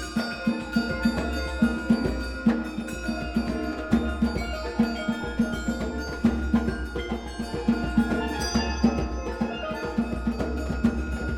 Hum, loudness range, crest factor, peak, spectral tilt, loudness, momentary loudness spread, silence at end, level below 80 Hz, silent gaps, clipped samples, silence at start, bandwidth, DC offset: none; 1 LU; 20 dB; -8 dBFS; -6 dB/octave; -27 LUFS; 6 LU; 0 s; -34 dBFS; none; under 0.1%; 0 s; 13 kHz; under 0.1%